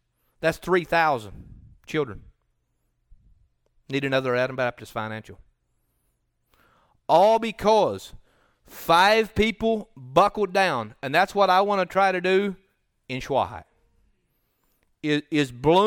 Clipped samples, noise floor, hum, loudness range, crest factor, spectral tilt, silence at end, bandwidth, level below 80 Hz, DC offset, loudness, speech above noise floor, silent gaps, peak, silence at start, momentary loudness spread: under 0.1%; -72 dBFS; none; 8 LU; 18 dB; -5 dB/octave; 0 s; 19 kHz; -52 dBFS; under 0.1%; -23 LUFS; 50 dB; none; -6 dBFS; 0.4 s; 14 LU